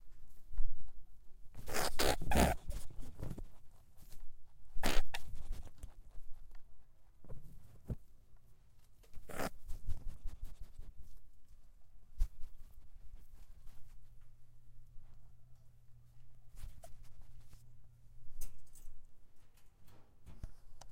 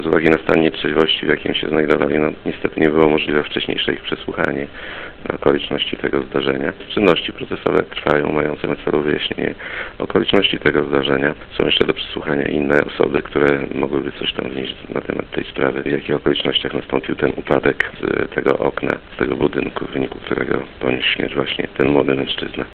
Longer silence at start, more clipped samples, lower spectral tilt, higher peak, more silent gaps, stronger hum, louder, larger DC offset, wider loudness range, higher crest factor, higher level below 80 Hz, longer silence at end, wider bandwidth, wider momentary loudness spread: about the same, 0 s vs 0 s; neither; second, -4 dB/octave vs -7 dB/octave; second, -14 dBFS vs 0 dBFS; neither; neither; second, -42 LUFS vs -18 LUFS; neither; first, 23 LU vs 3 LU; about the same, 22 dB vs 18 dB; about the same, -44 dBFS vs -42 dBFS; about the same, 0 s vs 0 s; first, 16 kHz vs 6.6 kHz; first, 26 LU vs 8 LU